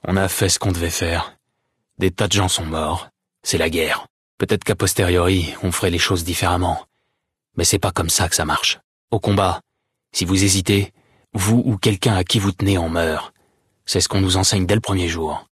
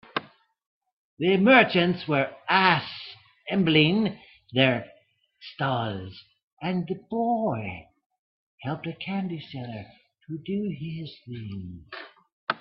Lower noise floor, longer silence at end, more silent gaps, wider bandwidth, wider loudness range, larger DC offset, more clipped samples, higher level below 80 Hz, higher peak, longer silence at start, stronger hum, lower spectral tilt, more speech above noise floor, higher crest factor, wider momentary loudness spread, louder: first, -75 dBFS vs -61 dBFS; about the same, 0.1 s vs 0.05 s; second, 4.10-4.38 s, 8.84-9.08 s vs 0.67-0.81 s, 0.93-1.17 s, 6.43-6.57 s, 8.06-8.10 s, 8.19-8.58 s, 12.32-12.47 s; first, 12 kHz vs 5.8 kHz; second, 2 LU vs 13 LU; neither; neither; first, -42 dBFS vs -66 dBFS; about the same, -2 dBFS vs -4 dBFS; about the same, 0.05 s vs 0.15 s; neither; second, -4 dB/octave vs -9.5 dB/octave; first, 57 dB vs 36 dB; second, 16 dB vs 24 dB; second, 9 LU vs 21 LU; first, -19 LUFS vs -25 LUFS